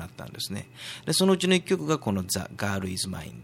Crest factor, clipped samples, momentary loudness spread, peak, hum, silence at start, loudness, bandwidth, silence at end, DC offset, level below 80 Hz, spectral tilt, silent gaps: 18 dB; under 0.1%; 14 LU; -10 dBFS; none; 0 s; -27 LUFS; 16.5 kHz; 0 s; under 0.1%; -58 dBFS; -4.5 dB/octave; none